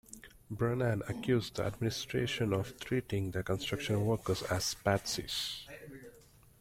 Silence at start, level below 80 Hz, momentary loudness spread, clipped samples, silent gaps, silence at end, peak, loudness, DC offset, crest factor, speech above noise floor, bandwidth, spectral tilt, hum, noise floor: 0.1 s; -58 dBFS; 15 LU; under 0.1%; none; 0.45 s; -14 dBFS; -34 LUFS; under 0.1%; 20 dB; 26 dB; 16.5 kHz; -5 dB/octave; none; -60 dBFS